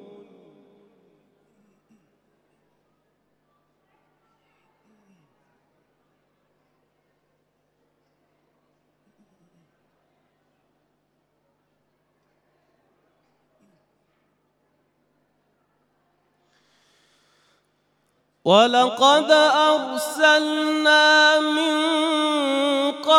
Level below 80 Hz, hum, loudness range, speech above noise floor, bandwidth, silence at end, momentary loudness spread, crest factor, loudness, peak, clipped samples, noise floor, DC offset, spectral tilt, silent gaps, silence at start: -84 dBFS; 50 Hz at -75 dBFS; 7 LU; 52 dB; 15.5 kHz; 0 s; 8 LU; 24 dB; -18 LUFS; -2 dBFS; under 0.1%; -70 dBFS; under 0.1%; -2.5 dB/octave; none; 18.45 s